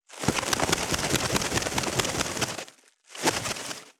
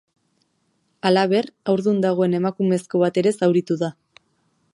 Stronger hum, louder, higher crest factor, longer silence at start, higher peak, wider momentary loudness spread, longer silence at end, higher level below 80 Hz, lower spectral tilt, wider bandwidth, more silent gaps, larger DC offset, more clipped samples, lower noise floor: neither; second, -27 LUFS vs -20 LUFS; first, 24 dB vs 18 dB; second, 0.1 s vs 1.05 s; second, -6 dBFS vs -2 dBFS; about the same, 8 LU vs 7 LU; second, 0.1 s vs 0.8 s; first, -48 dBFS vs -70 dBFS; second, -2.5 dB/octave vs -6.5 dB/octave; first, over 20 kHz vs 11.5 kHz; neither; neither; neither; second, -53 dBFS vs -68 dBFS